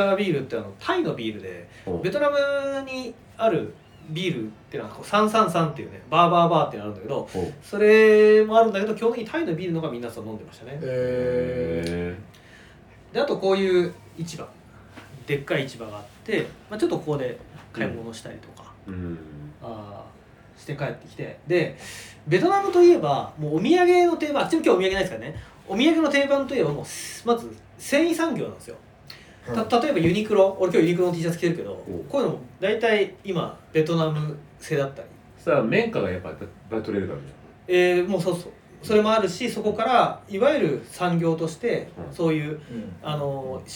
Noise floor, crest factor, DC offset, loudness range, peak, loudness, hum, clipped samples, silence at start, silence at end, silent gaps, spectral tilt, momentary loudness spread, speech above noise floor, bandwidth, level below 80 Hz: -49 dBFS; 20 dB; under 0.1%; 10 LU; -4 dBFS; -23 LUFS; none; under 0.1%; 0 s; 0 s; none; -6 dB/octave; 19 LU; 26 dB; 18.5 kHz; -56 dBFS